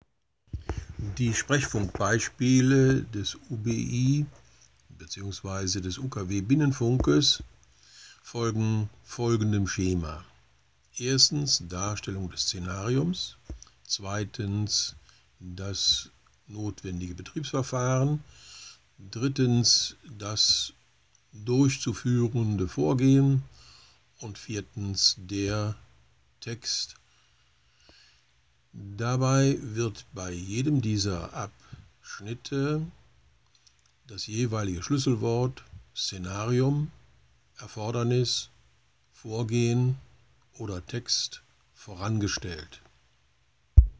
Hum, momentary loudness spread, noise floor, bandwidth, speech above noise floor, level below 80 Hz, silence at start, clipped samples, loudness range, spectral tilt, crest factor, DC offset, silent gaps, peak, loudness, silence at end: none; 19 LU; -69 dBFS; 8 kHz; 41 dB; -40 dBFS; 0.55 s; under 0.1%; 6 LU; -4.5 dB/octave; 26 dB; under 0.1%; none; -2 dBFS; -27 LUFS; 0.05 s